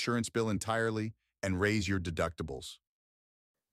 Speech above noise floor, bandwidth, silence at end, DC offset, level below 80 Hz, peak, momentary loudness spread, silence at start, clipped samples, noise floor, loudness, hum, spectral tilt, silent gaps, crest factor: over 57 dB; 15 kHz; 1 s; under 0.1%; -56 dBFS; -16 dBFS; 11 LU; 0 s; under 0.1%; under -90 dBFS; -34 LUFS; none; -5 dB/octave; none; 18 dB